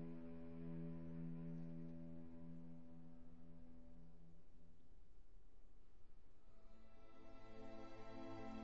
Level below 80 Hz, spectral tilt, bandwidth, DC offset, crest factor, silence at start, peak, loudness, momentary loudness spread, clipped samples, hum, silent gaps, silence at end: -66 dBFS; -8 dB/octave; 7.4 kHz; 0.2%; 14 dB; 0 s; -40 dBFS; -57 LUFS; 14 LU; under 0.1%; none; none; 0 s